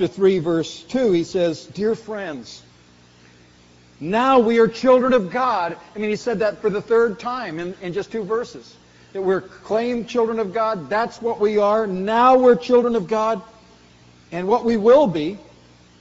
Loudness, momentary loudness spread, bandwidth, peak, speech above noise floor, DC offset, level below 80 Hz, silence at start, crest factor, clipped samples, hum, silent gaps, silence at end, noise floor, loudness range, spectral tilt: -19 LUFS; 14 LU; 8 kHz; -4 dBFS; 32 dB; under 0.1%; -56 dBFS; 0 s; 16 dB; under 0.1%; 60 Hz at -50 dBFS; none; 0.6 s; -51 dBFS; 6 LU; -4.5 dB/octave